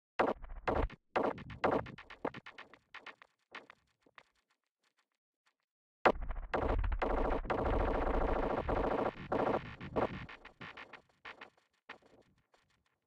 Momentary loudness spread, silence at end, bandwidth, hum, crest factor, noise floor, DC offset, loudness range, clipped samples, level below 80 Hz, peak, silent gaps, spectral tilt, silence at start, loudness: 19 LU; 1.1 s; 7.8 kHz; none; 24 dB; -81 dBFS; under 0.1%; 15 LU; under 0.1%; -44 dBFS; -14 dBFS; 4.71-4.75 s, 5.18-5.44 s, 5.64-6.05 s; -7.5 dB/octave; 0.2 s; -36 LUFS